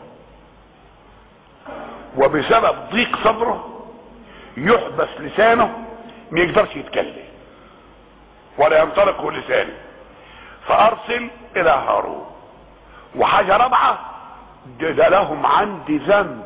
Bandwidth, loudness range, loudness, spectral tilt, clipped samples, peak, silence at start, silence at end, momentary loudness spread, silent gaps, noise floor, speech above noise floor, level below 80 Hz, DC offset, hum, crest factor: 4 kHz; 3 LU; -17 LUFS; -8.5 dB/octave; under 0.1%; -4 dBFS; 0 s; 0 s; 21 LU; none; -47 dBFS; 30 dB; -48 dBFS; under 0.1%; none; 14 dB